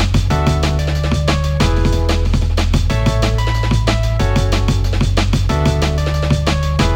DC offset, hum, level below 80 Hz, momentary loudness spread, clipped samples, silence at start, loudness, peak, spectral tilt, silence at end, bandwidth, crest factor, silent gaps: under 0.1%; none; -18 dBFS; 2 LU; under 0.1%; 0 s; -16 LUFS; -2 dBFS; -6 dB/octave; 0 s; 16 kHz; 12 dB; none